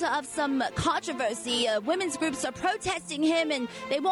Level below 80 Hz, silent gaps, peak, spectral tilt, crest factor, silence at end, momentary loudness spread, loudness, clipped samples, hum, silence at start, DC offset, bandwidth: -56 dBFS; none; -16 dBFS; -3.5 dB/octave; 12 dB; 0 s; 4 LU; -28 LUFS; under 0.1%; none; 0 s; under 0.1%; 12 kHz